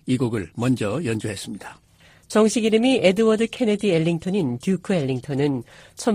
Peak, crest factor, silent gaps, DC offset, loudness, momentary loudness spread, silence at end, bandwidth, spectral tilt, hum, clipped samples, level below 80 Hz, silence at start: -4 dBFS; 18 dB; none; under 0.1%; -22 LUFS; 13 LU; 0 s; 15.5 kHz; -6 dB/octave; none; under 0.1%; -56 dBFS; 0.05 s